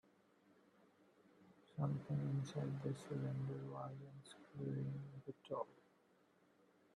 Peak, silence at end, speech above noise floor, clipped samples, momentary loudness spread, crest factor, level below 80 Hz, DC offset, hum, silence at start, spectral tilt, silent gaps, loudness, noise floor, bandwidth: -28 dBFS; 1.2 s; 29 dB; under 0.1%; 13 LU; 20 dB; -82 dBFS; under 0.1%; none; 1.4 s; -8 dB/octave; none; -47 LUFS; -75 dBFS; 11 kHz